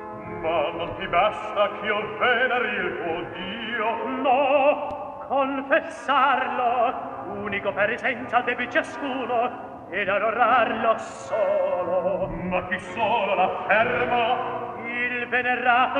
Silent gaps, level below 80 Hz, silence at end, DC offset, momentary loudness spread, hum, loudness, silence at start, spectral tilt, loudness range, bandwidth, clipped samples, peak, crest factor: none; -54 dBFS; 0 s; under 0.1%; 10 LU; none; -24 LUFS; 0 s; -5 dB/octave; 2 LU; 9.8 kHz; under 0.1%; -6 dBFS; 18 dB